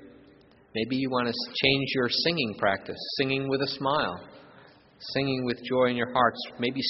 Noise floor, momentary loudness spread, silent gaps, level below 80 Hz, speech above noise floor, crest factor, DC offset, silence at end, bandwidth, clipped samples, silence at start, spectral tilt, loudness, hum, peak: -56 dBFS; 8 LU; none; -60 dBFS; 29 dB; 22 dB; under 0.1%; 0 s; 6 kHz; under 0.1%; 0 s; -2.5 dB/octave; -27 LUFS; none; -6 dBFS